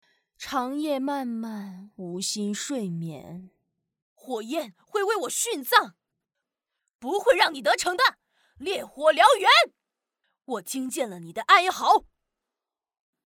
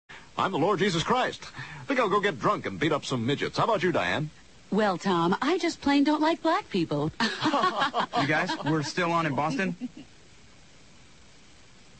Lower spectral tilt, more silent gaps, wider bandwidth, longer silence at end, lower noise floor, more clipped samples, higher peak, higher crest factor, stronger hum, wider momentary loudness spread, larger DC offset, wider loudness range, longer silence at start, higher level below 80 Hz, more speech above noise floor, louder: second, -2.5 dB/octave vs -5 dB/octave; first, 4.02-4.16 s, 6.95-6.99 s vs none; first, 19 kHz vs 8.8 kHz; second, 1.25 s vs 1.95 s; first, -89 dBFS vs -55 dBFS; neither; first, -4 dBFS vs -12 dBFS; first, 22 dB vs 16 dB; neither; first, 19 LU vs 7 LU; second, under 0.1% vs 0.2%; first, 11 LU vs 3 LU; first, 0.4 s vs 0.1 s; second, -70 dBFS vs -60 dBFS; first, 65 dB vs 28 dB; about the same, -24 LUFS vs -26 LUFS